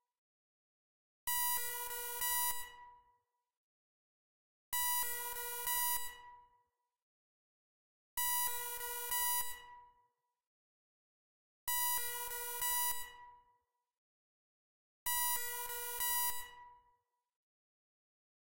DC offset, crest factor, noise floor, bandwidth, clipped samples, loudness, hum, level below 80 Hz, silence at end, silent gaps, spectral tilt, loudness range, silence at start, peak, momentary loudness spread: under 0.1%; 22 dB; -80 dBFS; 16 kHz; under 0.1%; -36 LUFS; none; -68 dBFS; 1 s; 0.18-1.27 s, 3.57-4.72 s, 7.02-8.17 s, 10.47-11.67 s, 13.98-15.06 s, 17.36-17.43 s; 2.5 dB/octave; 2 LU; 0 s; -20 dBFS; 11 LU